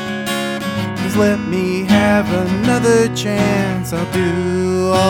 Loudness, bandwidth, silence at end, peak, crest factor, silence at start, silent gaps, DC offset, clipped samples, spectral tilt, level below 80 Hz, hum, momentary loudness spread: -16 LUFS; 18 kHz; 0 s; -2 dBFS; 14 dB; 0 s; none; under 0.1%; under 0.1%; -5.5 dB/octave; -40 dBFS; none; 7 LU